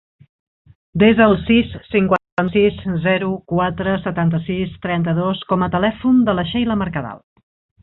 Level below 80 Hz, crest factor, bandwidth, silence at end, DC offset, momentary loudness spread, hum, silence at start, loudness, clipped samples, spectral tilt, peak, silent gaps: -42 dBFS; 16 dB; 4.1 kHz; 0.65 s; under 0.1%; 8 LU; none; 0.95 s; -18 LUFS; under 0.1%; -9.5 dB/octave; -2 dBFS; 2.32-2.37 s